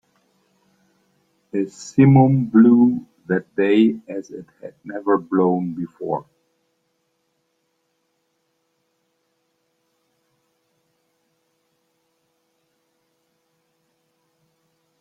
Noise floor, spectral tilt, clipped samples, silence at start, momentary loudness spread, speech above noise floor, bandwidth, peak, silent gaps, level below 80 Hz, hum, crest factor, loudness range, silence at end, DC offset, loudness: -71 dBFS; -8.5 dB/octave; under 0.1%; 1.55 s; 19 LU; 53 dB; 7.8 kHz; -2 dBFS; none; -64 dBFS; none; 20 dB; 14 LU; 8.8 s; under 0.1%; -18 LUFS